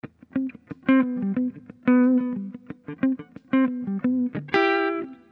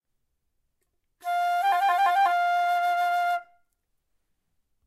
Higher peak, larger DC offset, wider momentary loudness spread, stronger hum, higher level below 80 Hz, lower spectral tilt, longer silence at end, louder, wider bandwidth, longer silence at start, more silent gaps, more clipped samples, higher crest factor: first, -4 dBFS vs -12 dBFS; neither; first, 13 LU vs 8 LU; neither; first, -68 dBFS vs -78 dBFS; first, -8 dB/octave vs 1 dB/octave; second, 0.2 s vs 1.45 s; about the same, -24 LUFS vs -24 LUFS; second, 5.4 kHz vs 15.5 kHz; second, 0.05 s vs 1.25 s; neither; neither; first, 20 dB vs 14 dB